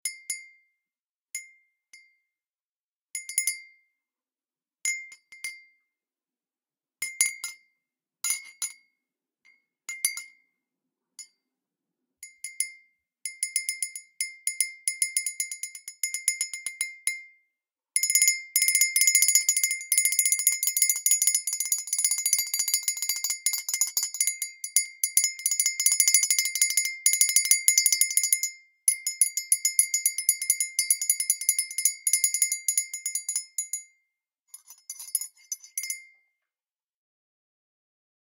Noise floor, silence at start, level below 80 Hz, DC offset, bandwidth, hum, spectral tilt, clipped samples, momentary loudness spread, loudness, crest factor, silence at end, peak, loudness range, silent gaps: under -90 dBFS; 0.05 s; under -90 dBFS; under 0.1%; 18 kHz; none; 6.5 dB/octave; under 0.1%; 16 LU; -24 LUFS; 28 dB; 2.3 s; 0 dBFS; 16 LU; 1.02-1.25 s, 2.61-3.08 s, 34.40-34.45 s